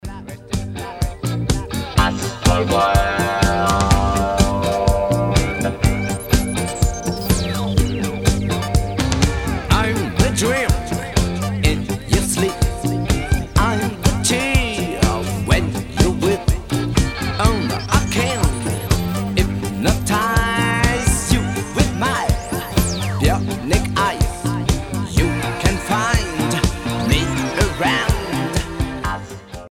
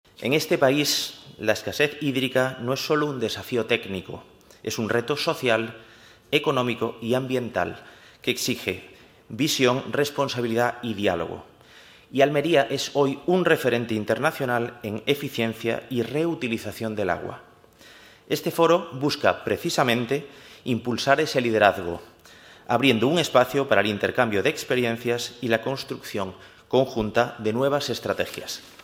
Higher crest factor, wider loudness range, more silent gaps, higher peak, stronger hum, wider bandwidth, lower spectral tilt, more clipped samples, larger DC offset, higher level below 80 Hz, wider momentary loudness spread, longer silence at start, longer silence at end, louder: second, 18 dB vs 24 dB; about the same, 2 LU vs 4 LU; neither; about the same, 0 dBFS vs -2 dBFS; neither; about the same, 17.5 kHz vs 16 kHz; about the same, -5 dB/octave vs -4.5 dB/octave; neither; neither; first, -24 dBFS vs -62 dBFS; second, 6 LU vs 11 LU; second, 0.05 s vs 0.2 s; second, 0 s vs 0.15 s; first, -19 LUFS vs -24 LUFS